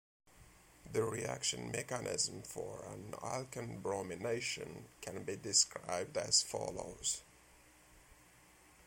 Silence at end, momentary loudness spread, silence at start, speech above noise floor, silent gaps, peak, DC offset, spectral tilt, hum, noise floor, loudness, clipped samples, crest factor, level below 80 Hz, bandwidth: 0 s; 14 LU; 0.3 s; 24 dB; none; -16 dBFS; under 0.1%; -2 dB/octave; none; -64 dBFS; -38 LUFS; under 0.1%; 26 dB; -68 dBFS; 16.5 kHz